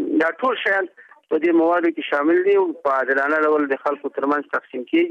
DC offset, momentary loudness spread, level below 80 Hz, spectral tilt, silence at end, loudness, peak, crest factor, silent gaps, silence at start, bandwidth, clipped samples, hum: under 0.1%; 8 LU; -72 dBFS; -5.5 dB/octave; 0 s; -20 LUFS; -8 dBFS; 12 dB; none; 0 s; 5.8 kHz; under 0.1%; none